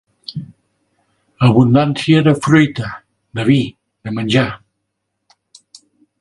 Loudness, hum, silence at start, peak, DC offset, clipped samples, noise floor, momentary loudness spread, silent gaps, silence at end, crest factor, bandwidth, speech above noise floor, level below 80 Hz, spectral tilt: -14 LUFS; none; 0.3 s; 0 dBFS; under 0.1%; under 0.1%; -73 dBFS; 18 LU; none; 1.65 s; 16 dB; 11.5 kHz; 60 dB; -50 dBFS; -7 dB/octave